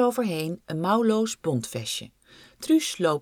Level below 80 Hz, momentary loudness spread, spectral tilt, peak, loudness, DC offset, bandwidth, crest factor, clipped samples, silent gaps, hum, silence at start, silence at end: -66 dBFS; 9 LU; -5 dB/octave; -8 dBFS; -26 LUFS; under 0.1%; 18 kHz; 16 dB; under 0.1%; none; none; 0 s; 0 s